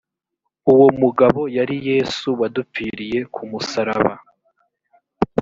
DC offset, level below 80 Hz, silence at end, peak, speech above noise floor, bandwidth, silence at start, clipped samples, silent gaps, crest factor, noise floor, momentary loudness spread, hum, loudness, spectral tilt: under 0.1%; -54 dBFS; 0 s; 0 dBFS; 60 dB; 7.6 kHz; 0.65 s; under 0.1%; none; 18 dB; -78 dBFS; 14 LU; none; -18 LUFS; -6.5 dB/octave